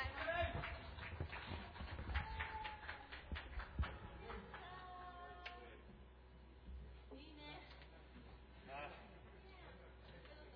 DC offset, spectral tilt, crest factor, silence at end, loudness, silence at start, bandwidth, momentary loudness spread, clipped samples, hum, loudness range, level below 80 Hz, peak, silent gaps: under 0.1%; -3.5 dB/octave; 22 dB; 0 s; -51 LUFS; 0 s; 5.4 kHz; 16 LU; under 0.1%; none; 10 LU; -56 dBFS; -30 dBFS; none